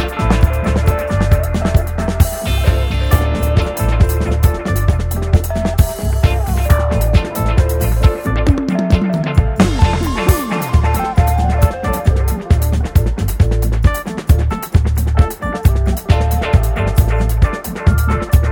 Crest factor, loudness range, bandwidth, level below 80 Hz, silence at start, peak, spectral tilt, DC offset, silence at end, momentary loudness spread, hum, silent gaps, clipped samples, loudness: 14 dB; 1 LU; 19.5 kHz; -16 dBFS; 0 s; 0 dBFS; -6.5 dB/octave; under 0.1%; 0 s; 2 LU; none; none; under 0.1%; -15 LUFS